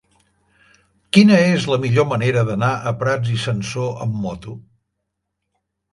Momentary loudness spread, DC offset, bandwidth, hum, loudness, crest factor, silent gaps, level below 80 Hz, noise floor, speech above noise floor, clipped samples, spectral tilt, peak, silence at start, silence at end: 14 LU; under 0.1%; 11.5 kHz; none; -18 LUFS; 20 dB; none; -52 dBFS; -77 dBFS; 60 dB; under 0.1%; -6.5 dB/octave; 0 dBFS; 1.15 s; 1.35 s